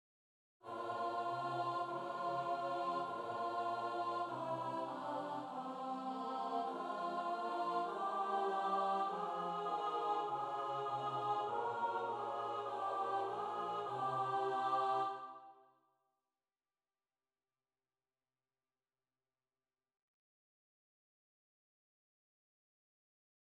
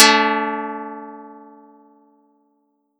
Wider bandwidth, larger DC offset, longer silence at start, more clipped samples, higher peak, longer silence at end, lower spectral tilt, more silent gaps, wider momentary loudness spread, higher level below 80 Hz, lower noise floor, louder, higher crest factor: second, 12 kHz vs 17.5 kHz; neither; first, 0.65 s vs 0 s; neither; second, -26 dBFS vs 0 dBFS; first, 7.95 s vs 1.6 s; first, -5.5 dB/octave vs -1 dB/octave; neither; second, 6 LU vs 25 LU; about the same, under -90 dBFS vs -86 dBFS; first, under -90 dBFS vs -67 dBFS; second, -40 LUFS vs -18 LUFS; second, 16 dB vs 22 dB